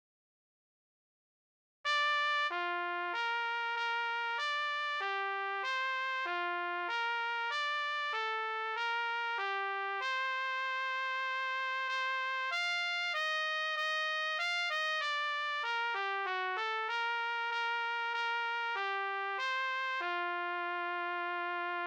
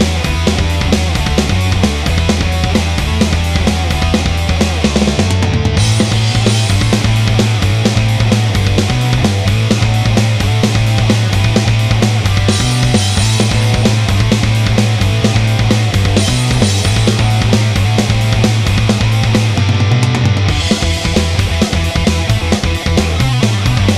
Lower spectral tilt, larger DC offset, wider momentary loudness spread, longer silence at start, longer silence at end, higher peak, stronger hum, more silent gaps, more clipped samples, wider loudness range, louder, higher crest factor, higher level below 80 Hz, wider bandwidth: second, 1.5 dB/octave vs -5 dB/octave; second, under 0.1% vs 0.2%; about the same, 3 LU vs 2 LU; first, 1.85 s vs 0 s; about the same, 0 s vs 0 s; second, -22 dBFS vs 0 dBFS; neither; neither; neither; about the same, 2 LU vs 1 LU; second, -34 LUFS vs -12 LUFS; about the same, 14 dB vs 12 dB; second, under -90 dBFS vs -22 dBFS; first, 18 kHz vs 14 kHz